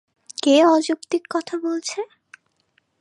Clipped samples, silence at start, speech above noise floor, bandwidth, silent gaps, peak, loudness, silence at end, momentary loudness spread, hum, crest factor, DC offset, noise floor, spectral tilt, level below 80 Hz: under 0.1%; 0.45 s; 47 dB; 11.5 kHz; none; -4 dBFS; -20 LUFS; 0.95 s; 17 LU; none; 18 dB; under 0.1%; -66 dBFS; -2 dB/octave; -80 dBFS